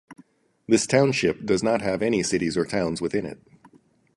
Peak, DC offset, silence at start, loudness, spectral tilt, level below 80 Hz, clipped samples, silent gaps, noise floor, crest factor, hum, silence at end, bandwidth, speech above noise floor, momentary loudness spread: -6 dBFS; under 0.1%; 0.1 s; -23 LUFS; -4.5 dB/octave; -54 dBFS; under 0.1%; none; -58 dBFS; 20 dB; none; 0.8 s; 11.5 kHz; 35 dB; 7 LU